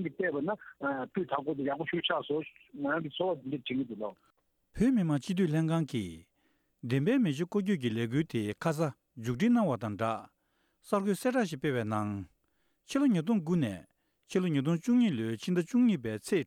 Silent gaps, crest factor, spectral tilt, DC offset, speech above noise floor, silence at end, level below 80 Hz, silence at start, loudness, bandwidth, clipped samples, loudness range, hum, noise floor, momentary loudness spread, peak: none; 16 dB; -6.5 dB/octave; under 0.1%; 46 dB; 0 s; -64 dBFS; 0 s; -31 LUFS; 15 kHz; under 0.1%; 3 LU; none; -76 dBFS; 10 LU; -14 dBFS